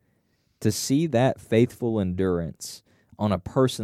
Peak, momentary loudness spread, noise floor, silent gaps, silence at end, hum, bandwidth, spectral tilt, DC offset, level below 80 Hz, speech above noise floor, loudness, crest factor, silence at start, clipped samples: -6 dBFS; 12 LU; -69 dBFS; none; 0 s; none; 15.5 kHz; -6 dB/octave; under 0.1%; -52 dBFS; 45 dB; -25 LUFS; 18 dB; 0.6 s; under 0.1%